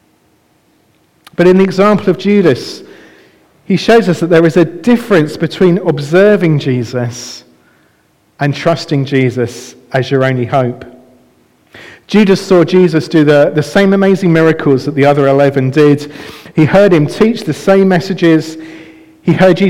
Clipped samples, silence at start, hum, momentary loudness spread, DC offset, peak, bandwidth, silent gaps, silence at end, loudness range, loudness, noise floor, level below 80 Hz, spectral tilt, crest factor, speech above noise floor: under 0.1%; 1.4 s; none; 11 LU; under 0.1%; 0 dBFS; 15.5 kHz; none; 0 s; 6 LU; -10 LUFS; -53 dBFS; -46 dBFS; -7 dB/octave; 10 dB; 43 dB